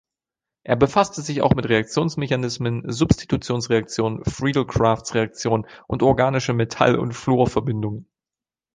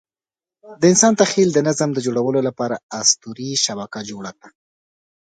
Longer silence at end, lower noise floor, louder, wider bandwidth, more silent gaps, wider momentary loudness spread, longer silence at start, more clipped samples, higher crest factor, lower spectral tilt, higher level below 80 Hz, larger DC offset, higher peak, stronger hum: about the same, 0.7 s vs 0.7 s; about the same, under -90 dBFS vs under -90 dBFS; second, -21 LUFS vs -17 LUFS; about the same, 9.8 kHz vs 9.4 kHz; second, none vs 2.83-2.89 s; second, 7 LU vs 16 LU; about the same, 0.65 s vs 0.65 s; neither; about the same, 20 dB vs 20 dB; first, -6 dB/octave vs -3.5 dB/octave; first, -42 dBFS vs -64 dBFS; neither; about the same, -2 dBFS vs 0 dBFS; neither